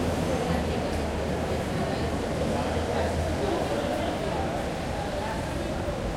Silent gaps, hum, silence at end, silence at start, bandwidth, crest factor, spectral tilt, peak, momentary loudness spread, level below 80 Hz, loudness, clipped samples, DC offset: none; none; 0 s; 0 s; 16 kHz; 16 dB; -6 dB/octave; -12 dBFS; 3 LU; -38 dBFS; -29 LUFS; under 0.1%; under 0.1%